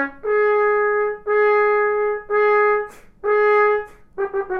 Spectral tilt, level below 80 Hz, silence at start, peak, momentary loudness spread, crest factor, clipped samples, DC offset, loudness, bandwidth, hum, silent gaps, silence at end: -5 dB/octave; -52 dBFS; 0 s; -6 dBFS; 9 LU; 12 dB; under 0.1%; under 0.1%; -18 LUFS; 5.2 kHz; none; none; 0 s